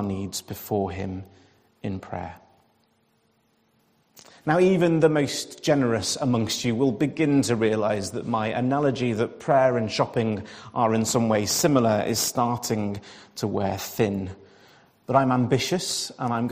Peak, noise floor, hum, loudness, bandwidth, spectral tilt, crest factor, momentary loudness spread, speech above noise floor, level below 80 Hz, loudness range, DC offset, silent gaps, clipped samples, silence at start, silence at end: -6 dBFS; -66 dBFS; none; -24 LUFS; 15.5 kHz; -5 dB/octave; 20 dB; 13 LU; 43 dB; -60 dBFS; 10 LU; under 0.1%; none; under 0.1%; 0 s; 0 s